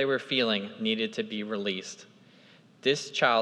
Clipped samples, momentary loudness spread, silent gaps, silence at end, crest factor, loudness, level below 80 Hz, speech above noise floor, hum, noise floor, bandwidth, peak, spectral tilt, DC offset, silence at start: under 0.1%; 9 LU; none; 0 s; 22 dB; -29 LUFS; -90 dBFS; 28 dB; none; -57 dBFS; 11.5 kHz; -8 dBFS; -3.5 dB/octave; under 0.1%; 0 s